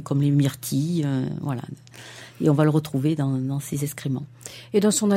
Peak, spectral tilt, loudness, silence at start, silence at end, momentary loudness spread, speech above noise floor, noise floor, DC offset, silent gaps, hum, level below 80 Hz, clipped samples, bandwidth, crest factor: -6 dBFS; -6 dB/octave; -24 LUFS; 0 s; 0 s; 19 LU; 20 dB; -43 dBFS; under 0.1%; none; none; -62 dBFS; under 0.1%; 16 kHz; 18 dB